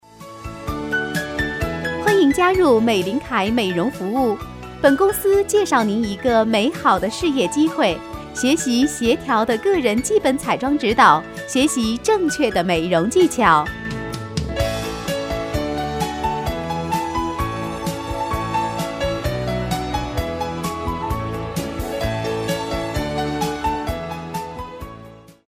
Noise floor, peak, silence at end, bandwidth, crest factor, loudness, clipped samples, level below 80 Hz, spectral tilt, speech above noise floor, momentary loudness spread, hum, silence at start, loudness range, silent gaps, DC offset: -42 dBFS; 0 dBFS; 0.2 s; 16 kHz; 20 dB; -20 LUFS; under 0.1%; -36 dBFS; -5 dB/octave; 24 dB; 11 LU; none; 0.15 s; 7 LU; none; under 0.1%